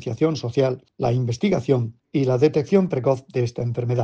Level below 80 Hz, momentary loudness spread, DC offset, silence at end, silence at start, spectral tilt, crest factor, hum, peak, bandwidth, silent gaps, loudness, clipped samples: -56 dBFS; 6 LU; under 0.1%; 0 s; 0 s; -8 dB/octave; 16 dB; none; -4 dBFS; 7.8 kHz; none; -22 LUFS; under 0.1%